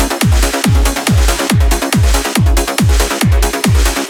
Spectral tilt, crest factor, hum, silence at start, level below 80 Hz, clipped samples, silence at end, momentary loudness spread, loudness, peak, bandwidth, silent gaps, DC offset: -4.5 dB/octave; 10 dB; none; 0 s; -14 dBFS; under 0.1%; 0 s; 1 LU; -12 LUFS; 0 dBFS; 19 kHz; none; under 0.1%